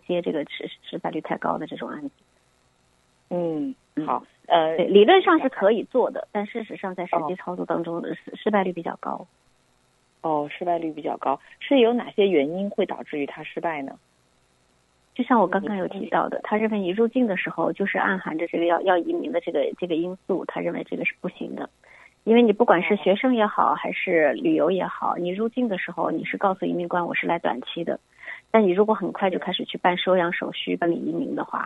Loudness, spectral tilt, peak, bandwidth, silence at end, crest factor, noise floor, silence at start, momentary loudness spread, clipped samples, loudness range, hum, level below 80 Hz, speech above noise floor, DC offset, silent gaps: -24 LUFS; -7.5 dB/octave; -2 dBFS; 8 kHz; 0 s; 22 dB; -64 dBFS; 0.1 s; 13 LU; under 0.1%; 8 LU; none; -70 dBFS; 41 dB; under 0.1%; none